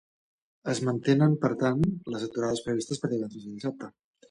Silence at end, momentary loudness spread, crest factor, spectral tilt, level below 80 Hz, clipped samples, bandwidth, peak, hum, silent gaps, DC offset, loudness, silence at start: 0.4 s; 13 LU; 18 dB; -6.5 dB/octave; -60 dBFS; under 0.1%; 11 kHz; -10 dBFS; none; none; under 0.1%; -28 LUFS; 0.65 s